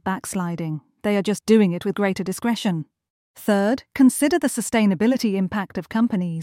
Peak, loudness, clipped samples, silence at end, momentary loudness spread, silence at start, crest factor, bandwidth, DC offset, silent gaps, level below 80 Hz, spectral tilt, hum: -4 dBFS; -21 LUFS; under 0.1%; 0 s; 10 LU; 0.05 s; 18 dB; 16.5 kHz; under 0.1%; 3.10-3.34 s; -58 dBFS; -5.5 dB/octave; none